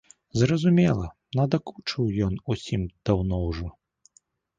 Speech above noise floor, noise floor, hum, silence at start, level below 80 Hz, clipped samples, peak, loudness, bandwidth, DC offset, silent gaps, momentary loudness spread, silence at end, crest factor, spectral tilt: 40 dB; -64 dBFS; none; 0.35 s; -42 dBFS; under 0.1%; -8 dBFS; -26 LUFS; 7.8 kHz; under 0.1%; none; 11 LU; 0.9 s; 18 dB; -7 dB/octave